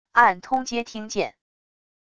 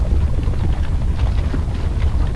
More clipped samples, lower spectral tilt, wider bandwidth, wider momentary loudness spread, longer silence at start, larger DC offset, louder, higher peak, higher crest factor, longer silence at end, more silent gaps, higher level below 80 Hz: neither; second, -3 dB/octave vs -8 dB/octave; about the same, 11 kHz vs 11 kHz; first, 12 LU vs 3 LU; first, 0.15 s vs 0 s; second, under 0.1% vs 1%; about the same, -23 LUFS vs -21 LUFS; about the same, -2 dBFS vs -4 dBFS; first, 22 dB vs 12 dB; first, 0.8 s vs 0 s; neither; second, -60 dBFS vs -18 dBFS